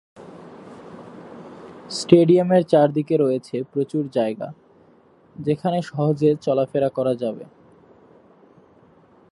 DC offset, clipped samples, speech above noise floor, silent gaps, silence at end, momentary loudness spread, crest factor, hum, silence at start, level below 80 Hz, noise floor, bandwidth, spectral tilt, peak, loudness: under 0.1%; under 0.1%; 34 dB; none; 1.9 s; 25 LU; 22 dB; none; 0.2 s; -66 dBFS; -54 dBFS; 11 kHz; -7.5 dB/octave; 0 dBFS; -20 LUFS